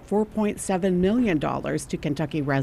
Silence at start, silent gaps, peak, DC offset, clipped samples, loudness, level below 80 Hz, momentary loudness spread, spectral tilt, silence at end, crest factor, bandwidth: 0 s; none; -10 dBFS; under 0.1%; under 0.1%; -25 LUFS; -46 dBFS; 7 LU; -6.5 dB/octave; 0 s; 14 dB; 13.5 kHz